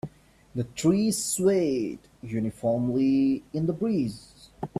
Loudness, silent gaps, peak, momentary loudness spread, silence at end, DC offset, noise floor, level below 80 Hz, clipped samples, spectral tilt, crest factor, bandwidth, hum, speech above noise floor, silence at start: -26 LUFS; none; -10 dBFS; 14 LU; 0 s; under 0.1%; -45 dBFS; -58 dBFS; under 0.1%; -6 dB/octave; 16 dB; 15 kHz; none; 20 dB; 0.05 s